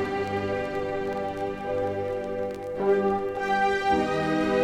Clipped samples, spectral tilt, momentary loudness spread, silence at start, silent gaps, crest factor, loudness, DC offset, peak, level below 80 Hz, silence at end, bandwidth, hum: under 0.1%; -6 dB/octave; 7 LU; 0 s; none; 14 dB; -27 LUFS; under 0.1%; -12 dBFS; -52 dBFS; 0 s; 11 kHz; none